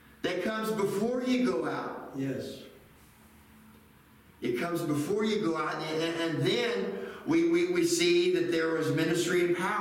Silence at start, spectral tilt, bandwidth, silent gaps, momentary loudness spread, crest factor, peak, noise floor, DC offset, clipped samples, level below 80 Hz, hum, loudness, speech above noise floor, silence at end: 0.25 s; -4.5 dB/octave; 16.5 kHz; none; 10 LU; 16 dB; -14 dBFS; -58 dBFS; under 0.1%; under 0.1%; -68 dBFS; none; -29 LUFS; 29 dB; 0 s